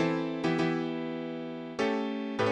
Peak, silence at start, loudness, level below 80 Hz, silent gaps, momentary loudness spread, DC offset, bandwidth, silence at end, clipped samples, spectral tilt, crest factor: -16 dBFS; 0 s; -32 LUFS; -72 dBFS; none; 8 LU; under 0.1%; 9.8 kHz; 0 s; under 0.1%; -6.5 dB/octave; 14 dB